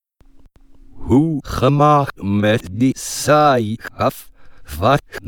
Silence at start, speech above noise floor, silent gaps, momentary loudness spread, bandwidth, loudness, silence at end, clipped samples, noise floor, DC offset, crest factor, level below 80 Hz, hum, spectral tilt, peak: 0.9 s; 30 dB; none; 9 LU; 19 kHz; -16 LUFS; 0 s; under 0.1%; -46 dBFS; under 0.1%; 16 dB; -40 dBFS; none; -6 dB/octave; -2 dBFS